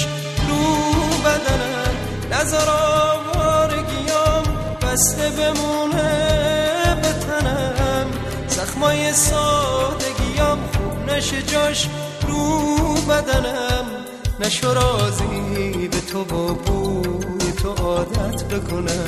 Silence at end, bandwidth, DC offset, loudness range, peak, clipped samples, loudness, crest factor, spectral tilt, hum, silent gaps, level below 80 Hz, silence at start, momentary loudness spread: 0 s; 13.5 kHz; under 0.1%; 3 LU; -4 dBFS; under 0.1%; -19 LUFS; 16 dB; -4 dB/octave; none; none; -30 dBFS; 0 s; 7 LU